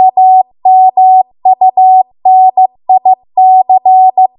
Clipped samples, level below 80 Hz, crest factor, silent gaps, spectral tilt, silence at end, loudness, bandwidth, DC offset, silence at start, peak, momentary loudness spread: under 0.1%; -66 dBFS; 6 dB; none; -9.5 dB/octave; 0.15 s; -7 LUFS; 1 kHz; under 0.1%; 0 s; 0 dBFS; 4 LU